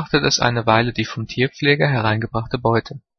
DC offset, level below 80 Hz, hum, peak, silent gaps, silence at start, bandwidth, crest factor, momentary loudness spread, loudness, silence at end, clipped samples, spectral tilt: under 0.1%; -44 dBFS; none; 0 dBFS; none; 0 s; 6.6 kHz; 18 dB; 7 LU; -19 LUFS; 0.2 s; under 0.1%; -5 dB/octave